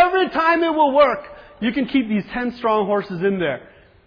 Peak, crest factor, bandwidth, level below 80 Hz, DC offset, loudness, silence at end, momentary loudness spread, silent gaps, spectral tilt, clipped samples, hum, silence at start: -4 dBFS; 16 dB; 5.4 kHz; -52 dBFS; under 0.1%; -19 LUFS; 0.45 s; 9 LU; none; -8 dB/octave; under 0.1%; none; 0 s